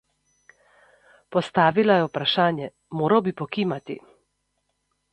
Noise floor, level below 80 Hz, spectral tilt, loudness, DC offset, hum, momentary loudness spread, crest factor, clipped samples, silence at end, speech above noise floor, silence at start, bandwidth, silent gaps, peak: -74 dBFS; -66 dBFS; -7 dB/octave; -23 LUFS; under 0.1%; 50 Hz at -55 dBFS; 14 LU; 20 dB; under 0.1%; 1.15 s; 52 dB; 1.3 s; 9.2 kHz; none; -4 dBFS